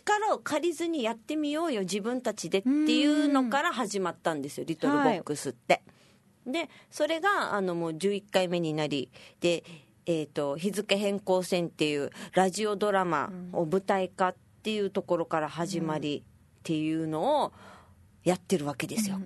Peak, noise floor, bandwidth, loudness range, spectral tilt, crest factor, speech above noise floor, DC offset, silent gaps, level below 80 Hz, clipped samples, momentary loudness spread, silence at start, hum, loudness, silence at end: -8 dBFS; -61 dBFS; 12.5 kHz; 4 LU; -4.5 dB/octave; 22 dB; 32 dB; under 0.1%; none; -72 dBFS; under 0.1%; 8 LU; 0.05 s; none; -29 LUFS; 0 s